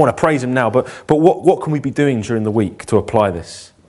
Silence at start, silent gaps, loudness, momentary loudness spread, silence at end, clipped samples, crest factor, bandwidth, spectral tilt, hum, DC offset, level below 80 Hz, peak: 0 s; none; -16 LUFS; 6 LU; 0.2 s; under 0.1%; 16 dB; 11.5 kHz; -7 dB/octave; none; under 0.1%; -46 dBFS; 0 dBFS